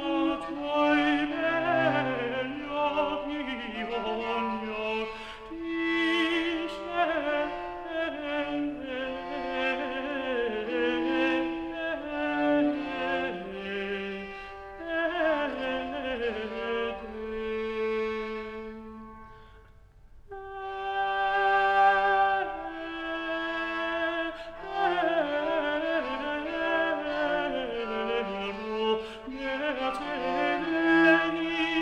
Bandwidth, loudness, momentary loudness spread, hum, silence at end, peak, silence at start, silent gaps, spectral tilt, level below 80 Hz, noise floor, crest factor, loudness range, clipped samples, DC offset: 9.4 kHz; -29 LUFS; 12 LU; none; 0 s; -10 dBFS; 0 s; none; -5.5 dB/octave; -54 dBFS; -53 dBFS; 18 dB; 6 LU; under 0.1%; under 0.1%